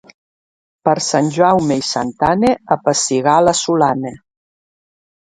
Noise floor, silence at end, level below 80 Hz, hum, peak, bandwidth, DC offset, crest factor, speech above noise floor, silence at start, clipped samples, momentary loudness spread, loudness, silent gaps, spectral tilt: under -90 dBFS; 1.05 s; -50 dBFS; none; 0 dBFS; 11 kHz; under 0.1%; 16 dB; over 75 dB; 0.85 s; under 0.1%; 6 LU; -15 LUFS; none; -4 dB/octave